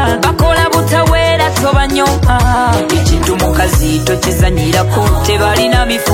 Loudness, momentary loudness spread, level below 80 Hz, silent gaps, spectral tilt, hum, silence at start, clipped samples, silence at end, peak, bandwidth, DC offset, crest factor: -11 LUFS; 2 LU; -18 dBFS; none; -5 dB/octave; none; 0 s; under 0.1%; 0 s; 0 dBFS; 16.5 kHz; under 0.1%; 10 dB